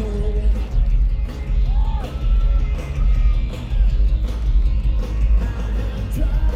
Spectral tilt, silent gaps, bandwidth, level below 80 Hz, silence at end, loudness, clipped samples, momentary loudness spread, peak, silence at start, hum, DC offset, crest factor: -7.5 dB/octave; none; 5.2 kHz; -18 dBFS; 0 s; -22 LUFS; under 0.1%; 5 LU; -6 dBFS; 0 s; none; under 0.1%; 10 dB